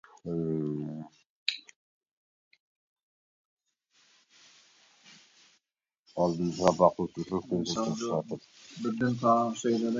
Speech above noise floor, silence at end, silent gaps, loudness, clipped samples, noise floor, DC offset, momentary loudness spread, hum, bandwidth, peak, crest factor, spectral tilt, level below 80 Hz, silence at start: 55 dB; 0 s; 1.26-1.46 s, 1.76-2.01 s, 2.11-2.51 s, 2.60-2.96 s, 3.03-3.57 s, 5.99-6.03 s; -30 LUFS; under 0.1%; -83 dBFS; under 0.1%; 16 LU; none; 7.8 kHz; -8 dBFS; 26 dB; -5.5 dB/octave; -64 dBFS; 0.25 s